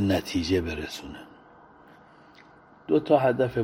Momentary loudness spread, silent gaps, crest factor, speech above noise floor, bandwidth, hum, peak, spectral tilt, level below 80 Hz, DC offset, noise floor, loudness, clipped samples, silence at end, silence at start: 21 LU; none; 22 dB; 28 dB; 16 kHz; none; -6 dBFS; -6 dB/octave; -50 dBFS; under 0.1%; -53 dBFS; -25 LUFS; under 0.1%; 0 s; 0 s